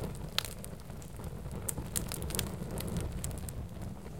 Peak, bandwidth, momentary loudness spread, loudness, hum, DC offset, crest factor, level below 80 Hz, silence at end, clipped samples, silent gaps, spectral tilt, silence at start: -8 dBFS; 17 kHz; 9 LU; -39 LUFS; none; 0.3%; 32 dB; -46 dBFS; 0 s; under 0.1%; none; -4 dB/octave; 0 s